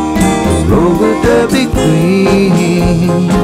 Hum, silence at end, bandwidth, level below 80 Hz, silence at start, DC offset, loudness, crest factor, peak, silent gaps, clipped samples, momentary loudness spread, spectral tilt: none; 0 s; 15.5 kHz; -24 dBFS; 0 s; under 0.1%; -10 LUFS; 10 dB; 0 dBFS; none; under 0.1%; 2 LU; -6.5 dB/octave